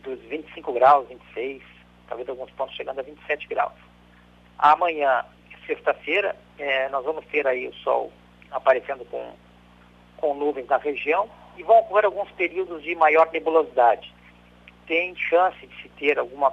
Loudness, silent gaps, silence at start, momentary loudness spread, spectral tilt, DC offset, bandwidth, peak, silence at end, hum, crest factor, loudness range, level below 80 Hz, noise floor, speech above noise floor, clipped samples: -23 LUFS; none; 0.05 s; 16 LU; -5.5 dB/octave; under 0.1%; 7.4 kHz; -6 dBFS; 0 s; 60 Hz at -55 dBFS; 18 dB; 6 LU; -60 dBFS; -53 dBFS; 30 dB; under 0.1%